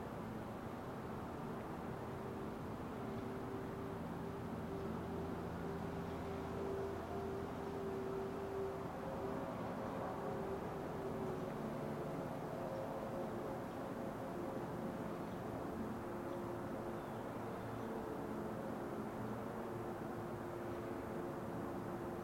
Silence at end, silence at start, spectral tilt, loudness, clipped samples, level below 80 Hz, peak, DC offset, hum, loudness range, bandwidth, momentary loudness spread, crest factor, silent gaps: 0 s; 0 s; -7 dB/octave; -45 LUFS; under 0.1%; -64 dBFS; -30 dBFS; under 0.1%; none; 2 LU; 16.5 kHz; 3 LU; 14 dB; none